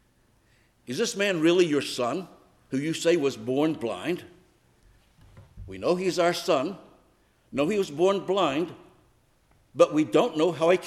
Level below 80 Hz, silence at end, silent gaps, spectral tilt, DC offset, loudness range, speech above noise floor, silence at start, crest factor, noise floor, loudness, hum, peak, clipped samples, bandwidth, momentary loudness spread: -62 dBFS; 0 s; none; -5 dB/octave; under 0.1%; 4 LU; 39 dB; 0.9 s; 20 dB; -64 dBFS; -26 LUFS; none; -6 dBFS; under 0.1%; 14.5 kHz; 13 LU